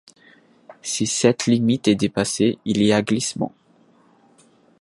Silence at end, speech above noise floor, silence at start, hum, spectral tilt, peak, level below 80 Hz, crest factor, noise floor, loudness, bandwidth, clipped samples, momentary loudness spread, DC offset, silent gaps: 1.35 s; 37 dB; 0.7 s; none; -4.5 dB/octave; -2 dBFS; -56 dBFS; 20 dB; -56 dBFS; -20 LUFS; 11.5 kHz; under 0.1%; 9 LU; under 0.1%; none